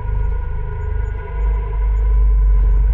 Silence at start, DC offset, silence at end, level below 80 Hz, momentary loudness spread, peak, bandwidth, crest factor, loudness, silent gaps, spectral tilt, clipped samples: 0 s; under 0.1%; 0 s; -16 dBFS; 9 LU; -8 dBFS; 2.6 kHz; 8 dB; -20 LUFS; none; -10 dB/octave; under 0.1%